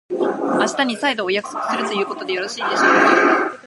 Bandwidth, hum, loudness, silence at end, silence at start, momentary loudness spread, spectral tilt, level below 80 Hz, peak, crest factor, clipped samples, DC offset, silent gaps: 11.5 kHz; none; -18 LUFS; 0 s; 0.1 s; 10 LU; -3 dB/octave; -74 dBFS; -2 dBFS; 18 dB; under 0.1%; under 0.1%; none